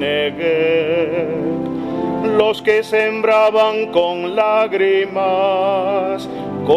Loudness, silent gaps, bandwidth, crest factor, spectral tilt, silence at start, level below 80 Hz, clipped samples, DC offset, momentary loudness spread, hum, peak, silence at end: -16 LUFS; none; 13.5 kHz; 16 dB; -6 dB/octave; 0 s; -54 dBFS; under 0.1%; under 0.1%; 8 LU; none; 0 dBFS; 0 s